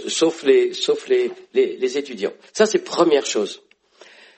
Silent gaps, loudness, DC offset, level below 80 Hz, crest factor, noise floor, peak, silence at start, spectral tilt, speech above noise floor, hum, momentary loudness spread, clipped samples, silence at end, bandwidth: none; -20 LUFS; under 0.1%; -70 dBFS; 18 dB; -50 dBFS; -2 dBFS; 0 s; -3 dB/octave; 31 dB; none; 10 LU; under 0.1%; 0.8 s; 8.8 kHz